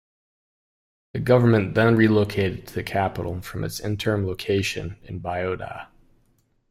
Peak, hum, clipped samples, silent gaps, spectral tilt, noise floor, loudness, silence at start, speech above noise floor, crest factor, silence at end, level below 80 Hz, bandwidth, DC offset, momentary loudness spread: -4 dBFS; none; under 0.1%; none; -6.5 dB/octave; -65 dBFS; -23 LUFS; 1.15 s; 42 dB; 20 dB; 0.85 s; -50 dBFS; 16 kHz; under 0.1%; 15 LU